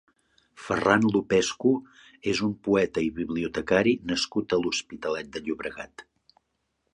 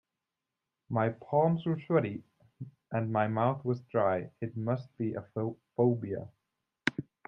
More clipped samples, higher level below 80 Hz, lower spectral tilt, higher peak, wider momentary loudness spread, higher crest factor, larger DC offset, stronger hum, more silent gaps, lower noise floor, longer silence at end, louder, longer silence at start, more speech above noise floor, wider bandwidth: neither; first, -56 dBFS vs -72 dBFS; second, -4.5 dB/octave vs -8.5 dB/octave; first, -4 dBFS vs -8 dBFS; about the same, 11 LU vs 11 LU; about the same, 24 dB vs 24 dB; neither; neither; neither; second, -76 dBFS vs -88 dBFS; first, 0.9 s vs 0.25 s; first, -26 LUFS vs -32 LUFS; second, 0.6 s vs 0.9 s; second, 51 dB vs 58 dB; first, 10.5 kHz vs 8.4 kHz